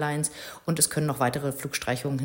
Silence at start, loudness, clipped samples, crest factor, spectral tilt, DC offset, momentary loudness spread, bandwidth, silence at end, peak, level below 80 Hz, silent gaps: 0 s; -27 LUFS; under 0.1%; 22 dB; -4 dB/octave; under 0.1%; 8 LU; 17 kHz; 0 s; -6 dBFS; -58 dBFS; none